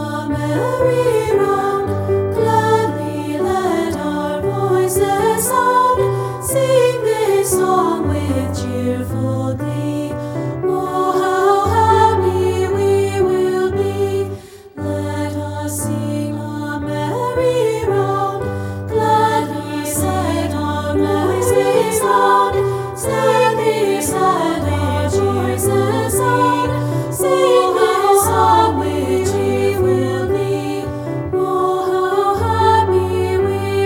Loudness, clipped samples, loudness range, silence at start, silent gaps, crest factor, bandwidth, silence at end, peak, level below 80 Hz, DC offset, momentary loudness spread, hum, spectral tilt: -16 LUFS; under 0.1%; 5 LU; 0 s; none; 14 dB; 19 kHz; 0 s; -2 dBFS; -42 dBFS; under 0.1%; 9 LU; none; -5.5 dB/octave